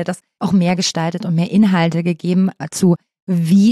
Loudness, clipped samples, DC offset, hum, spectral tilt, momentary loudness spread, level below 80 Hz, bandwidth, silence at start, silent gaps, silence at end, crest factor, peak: -17 LUFS; under 0.1%; under 0.1%; none; -6 dB/octave; 8 LU; -58 dBFS; 13 kHz; 0 s; 3.22-3.27 s; 0 s; 12 dB; -4 dBFS